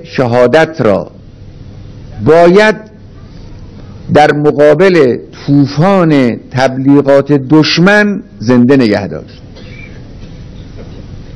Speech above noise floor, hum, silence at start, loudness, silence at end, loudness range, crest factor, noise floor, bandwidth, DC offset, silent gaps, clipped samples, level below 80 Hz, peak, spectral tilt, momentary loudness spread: 24 dB; none; 0 s; -8 LUFS; 0.05 s; 4 LU; 10 dB; -32 dBFS; 11 kHz; under 0.1%; none; 4%; -36 dBFS; 0 dBFS; -7 dB/octave; 23 LU